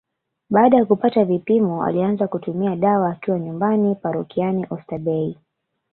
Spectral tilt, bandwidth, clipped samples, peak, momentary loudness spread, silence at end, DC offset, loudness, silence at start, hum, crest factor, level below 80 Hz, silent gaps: -12.5 dB/octave; 4.3 kHz; under 0.1%; -2 dBFS; 9 LU; 0.6 s; under 0.1%; -20 LUFS; 0.5 s; none; 18 dB; -62 dBFS; none